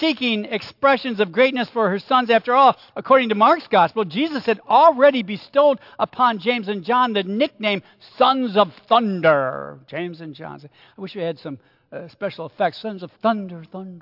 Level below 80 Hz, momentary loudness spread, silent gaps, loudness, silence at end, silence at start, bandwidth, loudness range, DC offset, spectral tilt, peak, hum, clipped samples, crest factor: -72 dBFS; 18 LU; none; -19 LUFS; 0 s; 0 s; 5.8 kHz; 11 LU; under 0.1%; -7 dB/octave; -2 dBFS; none; under 0.1%; 18 dB